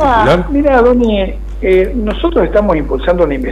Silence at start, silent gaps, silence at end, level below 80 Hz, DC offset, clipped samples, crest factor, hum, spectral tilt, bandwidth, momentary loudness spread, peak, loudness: 0 s; none; 0 s; -22 dBFS; under 0.1%; under 0.1%; 10 dB; none; -7.5 dB/octave; 11 kHz; 7 LU; -2 dBFS; -12 LUFS